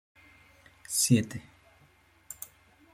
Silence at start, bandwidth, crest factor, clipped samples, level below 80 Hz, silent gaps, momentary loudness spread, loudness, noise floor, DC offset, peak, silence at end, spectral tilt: 0.9 s; 16 kHz; 24 dB; under 0.1%; -66 dBFS; none; 22 LU; -27 LUFS; -62 dBFS; under 0.1%; -10 dBFS; 0.5 s; -4 dB/octave